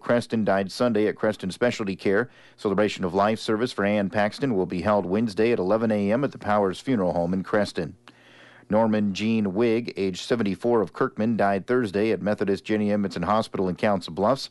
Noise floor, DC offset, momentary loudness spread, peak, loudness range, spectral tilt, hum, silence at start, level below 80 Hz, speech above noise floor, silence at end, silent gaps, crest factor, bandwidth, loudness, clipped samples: -51 dBFS; under 0.1%; 3 LU; -10 dBFS; 2 LU; -6.5 dB/octave; none; 0.05 s; -60 dBFS; 27 dB; 0.05 s; none; 14 dB; 11.5 kHz; -24 LUFS; under 0.1%